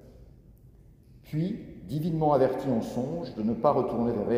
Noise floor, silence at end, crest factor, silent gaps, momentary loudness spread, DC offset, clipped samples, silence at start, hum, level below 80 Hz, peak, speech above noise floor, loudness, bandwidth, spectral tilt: -54 dBFS; 0 s; 20 dB; none; 10 LU; under 0.1%; under 0.1%; 0.05 s; none; -54 dBFS; -8 dBFS; 27 dB; -28 LUFS; 16 kHz; -8.5 dB/octave